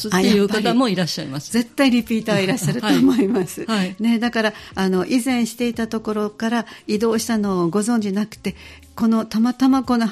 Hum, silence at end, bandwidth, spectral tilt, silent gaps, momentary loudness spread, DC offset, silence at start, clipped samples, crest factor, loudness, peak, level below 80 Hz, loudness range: none; 0 s; 14.5 kHz; -5 dB/octave; none; 8 LU; under 0.1%; 0 s; under 0.1%; 16 dB; -20 LUFS; -4 dBFS; -52 dBFS; 3 LU